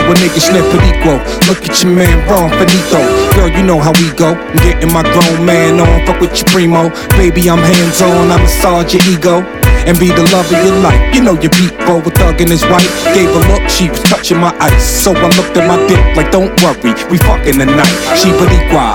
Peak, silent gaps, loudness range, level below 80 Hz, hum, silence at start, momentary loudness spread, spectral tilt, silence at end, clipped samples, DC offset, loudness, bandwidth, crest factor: 0 dBFS; none; 1 LU; -16 dBFS; none; 0 s; 3 LU; -5 dB/octave; 0 s; 0.4%; under 0.1%; -8 LUFS; 19 kHz; 8 dB